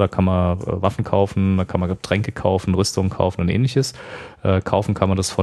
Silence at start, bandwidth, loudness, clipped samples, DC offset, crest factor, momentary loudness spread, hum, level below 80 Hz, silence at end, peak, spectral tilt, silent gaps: 0 s; 12.5 kHz; -20 LUFS; under 0.1%; under 0.1%; 18 dB; 4 LU; none; -42 dBFS; 0 s; 0 dBFS; -6.5 dB/octave; none